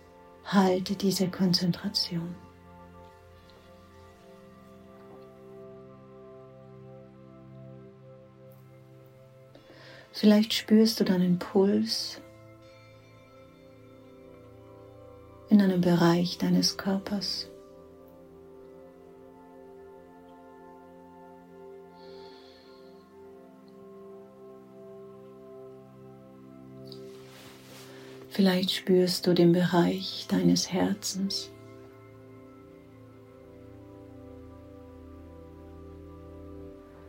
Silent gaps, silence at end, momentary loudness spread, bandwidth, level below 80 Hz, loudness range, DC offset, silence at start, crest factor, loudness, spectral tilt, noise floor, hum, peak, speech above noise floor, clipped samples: none; 0 s; 27 LU; 16.5 kHz; -64 dBFS; 24 LU; under 0.1%; 0.45 s; 22 dB; -26 LUFS; -5.5 dB/octave; -53 dBFS; none; -10 dBFS; 28 dB; under 0.1%